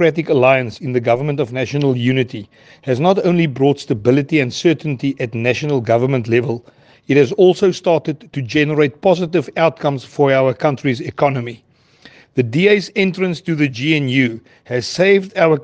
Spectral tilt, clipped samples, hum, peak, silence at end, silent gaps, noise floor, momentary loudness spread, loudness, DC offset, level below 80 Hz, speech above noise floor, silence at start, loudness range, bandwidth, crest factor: -6.5 dB/octave; under 0.1%; none; 0 dBFS; 0 s; none; -47 dBFS; 8 LU; -16 LUFS; under 0.1%; -58 dBFS; 31 dB; 0 s; 2 LU; 9 kHz; 16 dB